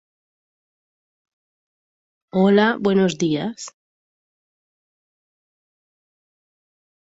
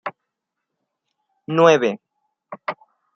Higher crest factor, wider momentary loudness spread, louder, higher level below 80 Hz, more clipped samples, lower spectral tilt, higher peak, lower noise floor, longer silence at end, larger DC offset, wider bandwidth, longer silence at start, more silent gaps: about the same, 20 dB vs 22 dB; second, 16 LU vs 20 LU; about the same, -19 LUFS vs -17 LUFS; first, -66 dBFS vs -72 dBFS; neither; about the same, -6 dB/octave vs -5.5 dB/octave; about the same, -4 dBFS vs -2 dBFS; first, under -90 dBFS vs -80 dBFS; first, 3.5 s vs 0.4 s; neither; first, 8 kHz vs 6.8 kHz; first, 2.35 s vs 0.05 s; neither